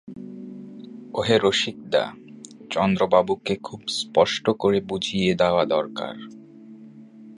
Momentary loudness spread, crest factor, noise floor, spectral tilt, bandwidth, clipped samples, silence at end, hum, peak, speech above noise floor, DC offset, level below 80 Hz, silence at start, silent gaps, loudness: 20 LU; 20 dB; -45 dBFS; -5 dB/octave; 11.5 kHz; under 0.1%; 0 s; none; -4 dBFS; 22 dB; under 0.1%; -56 dBFS; 0.05 s; none; -23 LUFS